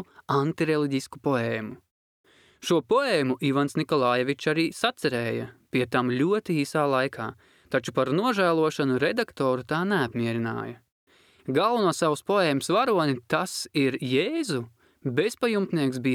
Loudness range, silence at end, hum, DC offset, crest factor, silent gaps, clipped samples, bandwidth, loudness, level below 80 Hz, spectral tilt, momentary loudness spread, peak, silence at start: 2 LU; 0 s; none; under 0.1%; 18 dB; 1.91-2.24 s, 10.92-11.07 s; under 0.1%; 16.5 kHz; -25 LUFS; -68 dBFS; -5.5 dB/octave; 7 LU; -8 dBFS; 0 s